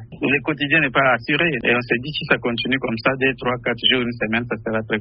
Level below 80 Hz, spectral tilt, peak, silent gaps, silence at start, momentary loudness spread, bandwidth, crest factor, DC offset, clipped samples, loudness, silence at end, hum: -50 dBFS; -2.5 dB/octave; -2 dBFS; none; 0 s; 6 LU; 5.8 kHz; 18 dB; under 0.1%; under 0.1%; -19 LUFS; 0 s; none